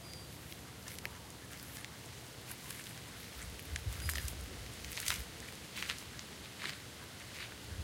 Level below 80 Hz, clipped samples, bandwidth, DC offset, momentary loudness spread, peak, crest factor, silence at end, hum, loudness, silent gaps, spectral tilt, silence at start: -52 dBFS; under 0.1%; 17 kHz; under 0.1%; 9 LU; -12 dBFS; 34 dB; 0 s; none; -44 LUFS; none; -2.5 dB/octave; 0 s